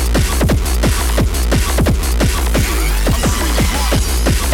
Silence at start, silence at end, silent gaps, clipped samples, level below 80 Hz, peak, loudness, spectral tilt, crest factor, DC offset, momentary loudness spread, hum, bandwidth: 0 s; 0 s; none; under 0.1%; -16 dBFS; -2 dBFS; -15 LUFS; -4.5 dB/octave; 12 dB; under 0.1%; 1 LU; none; 18 kHz